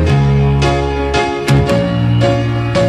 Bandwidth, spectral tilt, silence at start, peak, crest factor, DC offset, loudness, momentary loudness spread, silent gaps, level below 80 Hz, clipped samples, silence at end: 12.5 kHz; -7 dB/octave; 0 s; 0 dBFS; 12 dB; under 0.1%; -13 LUFS; 3 LU; none; -24 dBFS; under 0.1%; 0 s